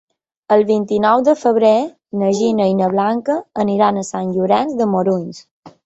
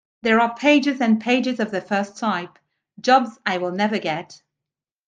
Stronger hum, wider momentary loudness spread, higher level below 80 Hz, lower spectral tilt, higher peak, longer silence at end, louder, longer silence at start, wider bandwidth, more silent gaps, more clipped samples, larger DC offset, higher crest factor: neither; about the same, 8 LU vs 9 LU; first, -60 dBFS vs -70 dBFS; first, -6.5 dB/octave vs -5 dB/octave; about the same, -2 dBFS vs -2 dBFS; second, 0.15 s vs 0.7 s; first, -16 LUFS vs -20 LUFS; first, 0.5 s vs 0.25 s; second, 8.2 kHz vs 9.2 kHz; first, 5.51-5.63 s vs none; neither; neither; about the same, 14 dB vs 18 dB